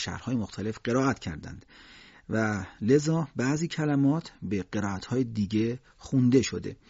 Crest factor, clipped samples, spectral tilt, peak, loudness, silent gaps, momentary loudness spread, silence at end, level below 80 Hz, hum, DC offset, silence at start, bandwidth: 18 dB; under 0.1%; -6.5 dB/octave; -10 dBFS; -28 LUFS; none; 11 LU; 0.15 s; -58 dBFS; none; under 0.1%; 0 s; 8 kHz